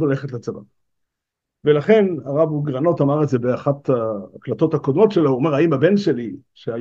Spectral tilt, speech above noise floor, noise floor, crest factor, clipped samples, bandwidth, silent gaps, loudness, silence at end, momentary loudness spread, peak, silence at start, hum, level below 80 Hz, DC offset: -8.5 dB/octave; 64 dB; -82 dBFS; 18 dB; under 0.1%; 7.4 kHz; none; -18 LUFS; 0 s; 14 LU; -2 dBFS; 0 s; none; -66 dBFS; under 0.1%